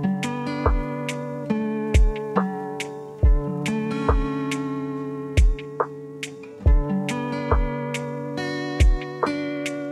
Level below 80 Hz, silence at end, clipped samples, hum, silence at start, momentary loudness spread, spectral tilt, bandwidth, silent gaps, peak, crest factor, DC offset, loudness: -26 dBFS; 0 s; under 0.1%; none; 0 s; 8 LU; -6.5 dB/octave; 12 kHz; none; -6 dBFS; 18 dB; under 0.1%; -25 LUFS